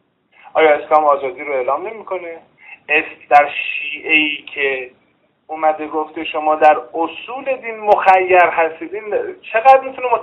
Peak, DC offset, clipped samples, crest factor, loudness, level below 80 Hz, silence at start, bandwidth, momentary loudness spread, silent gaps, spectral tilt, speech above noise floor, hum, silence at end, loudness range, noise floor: 0 dBFS; under 0.1%; 0.1%; 16 dB; -15 LUFS; -62 dBFS; 0.55 s; 6.6 kHz; 14 LU; none; -4.5 dB/octave; 34 dB; none; 0 s; 4 LU; -50 dBFS